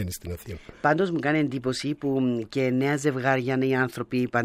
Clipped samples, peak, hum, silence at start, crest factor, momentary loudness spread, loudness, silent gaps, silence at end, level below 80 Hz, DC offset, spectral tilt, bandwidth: under 0.1%; -8 dBFS; none; 0 s; 18 dB; 9 LU; -25 LUFS; none; 0 s; -54 dBFS; under 0.1%; -6 dB/octave; 15.5 kHz